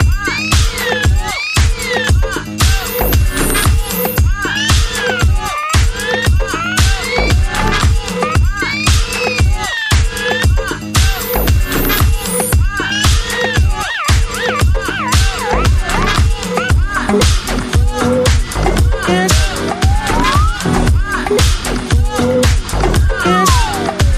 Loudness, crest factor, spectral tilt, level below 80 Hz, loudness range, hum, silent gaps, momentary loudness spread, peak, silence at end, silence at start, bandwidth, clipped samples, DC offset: -14 LUFS; 12 dB; -4 dB/octave; -16 dBFS; 1 LU; none; none; 3 LU; 0 dBFS; 0 s; 0 s; 15.5 kHz; under 0.1%; under 0.1%